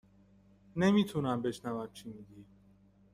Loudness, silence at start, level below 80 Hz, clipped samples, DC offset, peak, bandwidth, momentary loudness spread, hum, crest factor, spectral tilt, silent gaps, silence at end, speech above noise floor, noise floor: -33 LUFS; 0.75 s; -66 dBFS; under 0.1%; under 0.1%; -16 dBFS; 13.5 kHz; 22 LU; 50 Hz at -55 dBFS; 20 dB; -6.5 dB/octave; none; 0.7 s; 31 dB; -63 dBFS